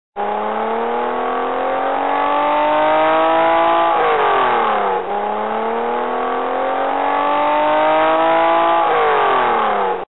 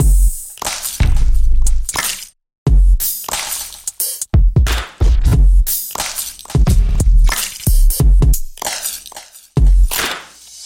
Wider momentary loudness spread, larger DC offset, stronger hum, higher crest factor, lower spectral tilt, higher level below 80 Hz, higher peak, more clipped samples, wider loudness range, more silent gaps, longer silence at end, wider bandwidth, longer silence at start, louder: second, 6 LU vs 9 LU; first, 1% vs under 0.1%; neither; about the same, 12 dB vs 10 dB; first, -9 dB/octave vs -4 dB/octave; second, -52 dBFS vs -14 dBFS; about the same, -4 dBFS vs -2 dBFS; neither; about the same, 3 LU vs 2 LU; second, none vs 2.58-2.66 s; about the same, 0 s vs 0 s; second, 4.2 kHz vs 17 kHz; about the same, 0.1 s vs 0 s; about the same, -16 LUFS vs -17 LUFS